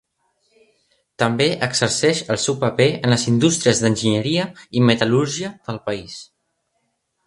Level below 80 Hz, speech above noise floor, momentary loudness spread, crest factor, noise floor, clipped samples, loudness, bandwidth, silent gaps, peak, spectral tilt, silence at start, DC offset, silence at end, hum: -54 dBFS; 53 dB; 11 LU; 20 dB; -71 dBFS; under 0.1%; -19 LUFS; 11.5 kHz; none; 0 dBFS; -4.5 dB/octave; 1.2 s; under 0.1%; 1 s; none